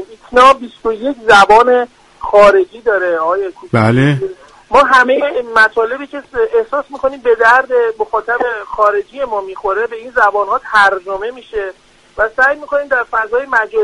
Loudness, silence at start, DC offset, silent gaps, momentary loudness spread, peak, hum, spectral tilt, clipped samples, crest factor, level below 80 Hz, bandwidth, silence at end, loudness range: -12 LUFS; 0 s; under 0.1%; none; 12 LU; 0 dBFS; none; -5.5 dB/octave; 0.1%; 12 dB; -44 dBFS; 11.5 kHz; 0 s; 4 LU